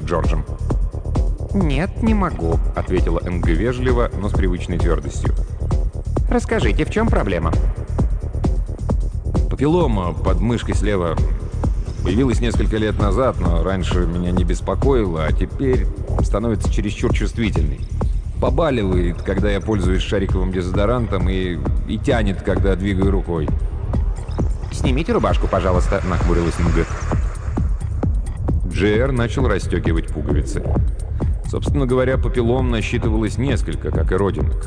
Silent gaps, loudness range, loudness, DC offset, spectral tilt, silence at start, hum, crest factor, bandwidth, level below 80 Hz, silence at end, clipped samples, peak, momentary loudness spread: none; 1 LU; -20 LUFS; under 0.1%; -7 dB/octave; 0 s; none; 14 dB; 10 kHz; -22 dBFS; 0 s; under 0.1%; -4 dBFS; 5 LU